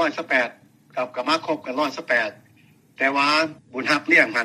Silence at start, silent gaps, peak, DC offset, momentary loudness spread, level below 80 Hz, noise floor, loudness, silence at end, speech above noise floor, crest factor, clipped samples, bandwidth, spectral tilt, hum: 0 s; none; 0 dBFS; under 0.1%; 12 LU; -74 dBFS; -55 dBFS; -21 LUFS; 0 s; 33 dB; 22 dB; under 0.1%; 15 kHz; -3 dB/octave; none